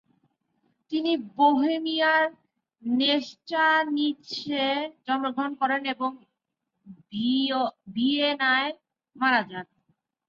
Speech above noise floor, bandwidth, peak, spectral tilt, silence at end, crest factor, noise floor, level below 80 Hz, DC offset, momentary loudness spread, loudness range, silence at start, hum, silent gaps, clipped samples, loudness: 57 dB; 7.2 kHz; -8 dBFS; -4.5 dB/octave; 0.65 s; 18 dB; -82 dBFS; -76 dBFS; under 0.1%; 11 LU; 5 LU; 0.9 s; none; none; under 0.1%; -25 LUFS